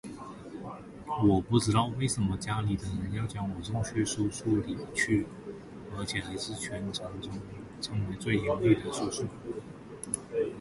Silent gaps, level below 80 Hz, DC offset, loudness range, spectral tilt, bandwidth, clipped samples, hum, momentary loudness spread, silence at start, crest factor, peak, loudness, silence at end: none; -50 dBFS; under 0.1%; 5 LU; -5.5 dB/octave; 11.5 kHz; under 0.1%; none; 17 LU; 0.05 s; 20 dB; -12 dBFS; -31 LUFS; 0 s